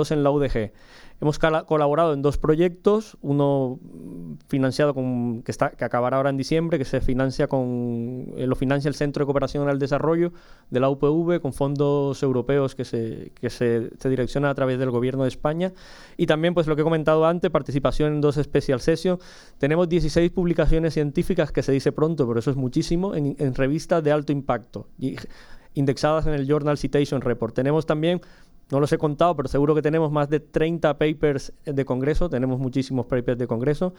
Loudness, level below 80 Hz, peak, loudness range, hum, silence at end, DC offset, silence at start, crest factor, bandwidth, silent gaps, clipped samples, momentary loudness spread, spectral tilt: -23 LUFS; -36 dBFS; -4 dBFS; 2 LU; none; 0.05 s; under 0.1%; 0 s; 18 dB; 12.5 kHz; none; under 0.1%; 8 LU; -7.5 dB/octave